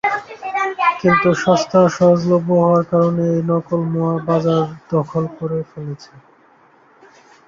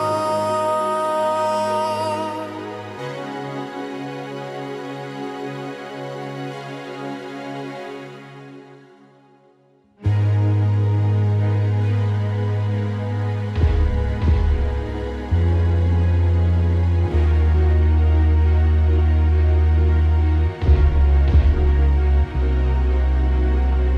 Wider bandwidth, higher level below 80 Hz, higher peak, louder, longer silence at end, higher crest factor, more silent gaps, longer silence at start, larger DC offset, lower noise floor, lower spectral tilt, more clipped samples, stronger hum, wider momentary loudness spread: second, 7.4 kHz vs 11 kHz; second, -56 dBFS vs -22 dBFS; first, -2 dBFS vs -6 dBFS; first, -17 LUFS vs -20 LUFS; first, 1.3 s vs 0 s; about the same, 16 dB vs 14 dB; neither; about the same, 0.05 s vs 0 s; neither; second, -51 dBFS vs -56 dBFS; about the same, -7 dB/octave vs -8 dB/octave; neither; neither; about the same, 11 LU vs 13 LU